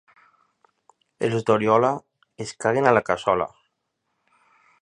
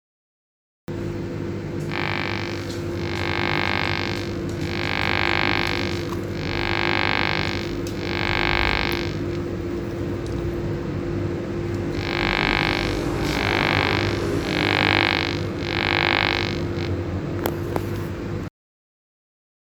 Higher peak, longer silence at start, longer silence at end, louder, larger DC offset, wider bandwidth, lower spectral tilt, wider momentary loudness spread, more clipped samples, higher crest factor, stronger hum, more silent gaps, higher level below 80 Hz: about the same, -2 dBFS vs 0 dBFS; first, 1.2 s vs 0.9 s; about the same, 1.35 s vs 1.25 s; about the same, -22 LUFS vs -23 LUFS; neither; second, 10.5 kHz vs over 20 kHz; about the same, -6 dB/octave vs -5.5 dB/octave; first, 14 LU vs 9 LU; neither; about the same, 24 dB vs 24 dB; neither; neither; second, -60 dBFS vs -38 dBFS